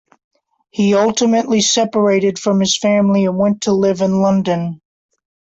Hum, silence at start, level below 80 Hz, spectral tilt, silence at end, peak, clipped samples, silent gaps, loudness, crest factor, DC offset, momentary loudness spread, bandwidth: none; 0.75 s; -56 dBFS; -4.5 dB/octave; 0.85 s; -2 dBFS; under 0.1%; none; -15 LUFS; 14 dB; under 0.1%; 5 LU; 8 kHz